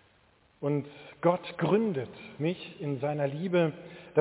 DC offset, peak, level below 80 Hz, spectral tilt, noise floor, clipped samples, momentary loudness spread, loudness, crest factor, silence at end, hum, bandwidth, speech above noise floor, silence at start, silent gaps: under 0.1%; -10 dBFS; -70 dBFS; -6.5 dB/octave; -64 dBFS; under 0.1%; 9 LU; -31 LUFS; 20 dB; 0 s; none; 4 kHz; 35 dB; 0.6 s; none